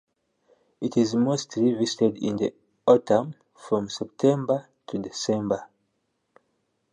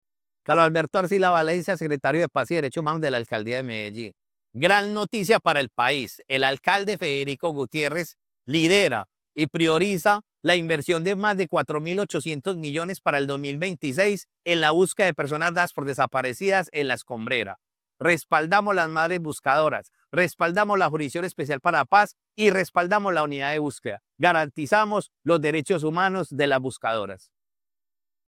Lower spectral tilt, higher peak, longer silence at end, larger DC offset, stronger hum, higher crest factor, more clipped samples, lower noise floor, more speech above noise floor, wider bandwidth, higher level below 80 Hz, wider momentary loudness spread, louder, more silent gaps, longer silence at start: first, -6 dB/octave vs -4.5 dB/octave; about the same, -4 dBFS vs -4 dBFS; about the same, 1.25 s vs 1.15 s; neither; neither; about the same, 22 dB vs 20 dB; neither; second, -75 dBFS vs under -90 dBFS; second, 51 dB vs over 66 dB; second, 10 kHz vs 17 kHz; about the same, -66 dBFS vs -66 dBFS; first, 12 LU vs 8 LU; about the same, -25 LUFS vs -24 LUFS; neither; first, 0.8 s vs 0.5 s